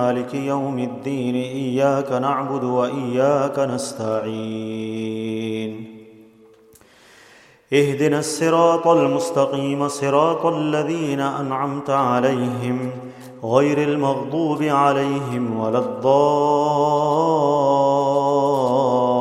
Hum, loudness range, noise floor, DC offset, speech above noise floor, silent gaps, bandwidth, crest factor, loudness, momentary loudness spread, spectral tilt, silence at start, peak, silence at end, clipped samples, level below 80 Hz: none; 8 LU; -51 dBFS; under 0.1%; 31 dB; none; 14.5 kHz; 18 dB; -20 LUFS; 9 LU; -6 dB/octave; 0 s; -2 dBFS; 0 s; under 0.1%; -66 dBFS